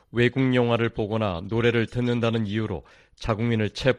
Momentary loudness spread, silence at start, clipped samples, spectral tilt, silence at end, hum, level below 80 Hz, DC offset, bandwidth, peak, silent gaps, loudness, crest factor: 8 LU; 0.15 s; under 0.1%; -7 dB/octave; 0 s; none; -46 dBFS; under 0.1%; 10 kHz; -6 dBFS; none; -24 LUFS; 18 dB